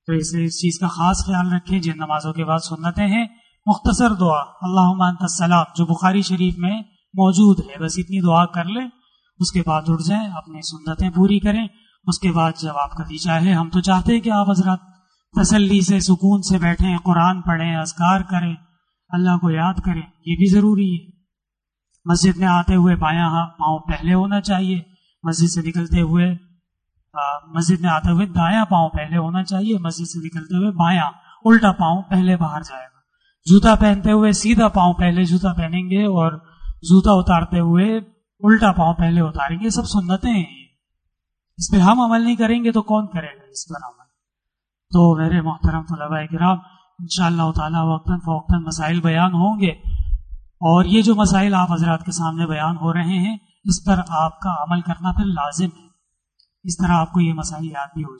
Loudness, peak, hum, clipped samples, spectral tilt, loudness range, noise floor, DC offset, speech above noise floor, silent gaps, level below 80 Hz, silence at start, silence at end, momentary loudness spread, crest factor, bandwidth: -18 LUFS; -2 dBFS; none; under 0.1%; -6 dB/octave; 4 LU; -84 dBFS; under 0.1%; 67 dB; none; -34 dBFS; 0.1 s; 0.05 s; 12 LU; 16 dB; 9.6 kHz